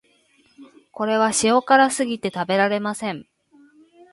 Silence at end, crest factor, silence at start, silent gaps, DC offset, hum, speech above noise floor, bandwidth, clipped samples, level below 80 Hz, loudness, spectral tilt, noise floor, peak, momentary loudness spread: 0.9 s; 20 dB; 0.6 s; none; under 0.1%; none; 40 dB; 11.5 kHz; under 0.1%; -64 dBFS; -20 LUFS; -3.5 dB/octave; -60 dBFS; -2 dBFS; 12 LU